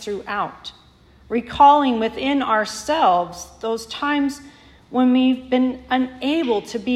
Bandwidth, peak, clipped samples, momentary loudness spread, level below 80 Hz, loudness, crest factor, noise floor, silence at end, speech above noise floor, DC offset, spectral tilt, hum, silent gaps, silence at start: 13 kHz; -2 dBFS; under 0.1%; 12 LU; -52 dBFS; -20 LUFS; 18 dB; -51 dBFS; 0 s; 31 dB; under 0.1%; -4 dB/octave; none; none; 0 s